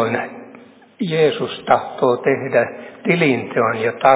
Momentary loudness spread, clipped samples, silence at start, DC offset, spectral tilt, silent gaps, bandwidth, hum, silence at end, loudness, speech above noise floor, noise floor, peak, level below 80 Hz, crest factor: 9 LU; under 0.1%; 0 s; under 0.1%; -10 dB/octave; none; 4 kHz; none; 0 s; -18 LUFS; 26 dB; -44 dBFS; 0 dBFS; -62 dBFS; 18 dB